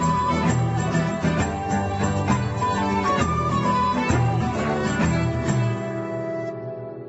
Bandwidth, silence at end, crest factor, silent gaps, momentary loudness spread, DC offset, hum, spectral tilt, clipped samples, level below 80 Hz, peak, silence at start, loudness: 8.2 kHz; 0 s; 16 dB; none; 7 LU; under 0.1%; none; -6.5 dB/octave; under 0.1%; -40 dBFS; -6 dBFS; 0 s; -23 LUFS